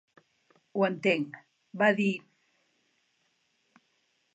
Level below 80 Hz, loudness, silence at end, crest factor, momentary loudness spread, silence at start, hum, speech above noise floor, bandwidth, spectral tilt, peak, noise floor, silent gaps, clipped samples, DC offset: -86 dBFS; -28 LUFS; 2.15 s; 22 dB; 17 LU; 0.75 s; none; 47 dB; 8.2 kHz; -6.5 dB/octave; -10 dBFS; -74 dBFS; none; under 0.1%; under 0.1%